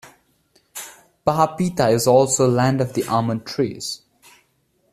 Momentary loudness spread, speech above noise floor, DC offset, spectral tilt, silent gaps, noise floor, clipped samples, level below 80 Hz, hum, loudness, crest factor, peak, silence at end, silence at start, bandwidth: 19 LU; 46 dB; under 0.1%; -5 dB/octave; none; -65 dBFS; under 0.1%; -54 dBFS; none; -19 LUFS; 18 dB; -2 dBFS; 0.95 s; 0.05 s; 14.5 kHz